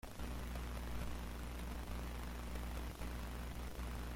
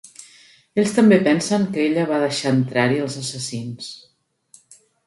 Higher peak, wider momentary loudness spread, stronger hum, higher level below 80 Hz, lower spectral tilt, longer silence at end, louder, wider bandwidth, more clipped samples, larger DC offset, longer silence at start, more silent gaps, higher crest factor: second, -30 dBFS vs -2 dBFS; second, 1 LU vs 15 LU; first, 60 Hz at -45 dBFS vs none; first, -46 dBFS vs -64 dBFS; about the same, -5 dB/octave vs -5.5 dB/octave; second, 0 s vs 1.1 s; second, -47 LUFS vs -19 LUFS; first, 16.5 kHz vs 11.5 kHz; neither; neither; second, 0.05 s vs 0.2 s; neither; about the same, 14 dB vs 18 dB